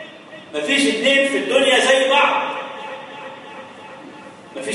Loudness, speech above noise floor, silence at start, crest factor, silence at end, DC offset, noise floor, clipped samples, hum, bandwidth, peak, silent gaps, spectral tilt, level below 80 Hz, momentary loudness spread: -16 LUFS; 23 dB; 0 s; 16 dB; 0 s; under 0.1%; -39 dBFS; under 0.1%; none; 11.5 kHz; -2 dBFS; none; -1.5 dB/octave; -68 dBFS; 23 LU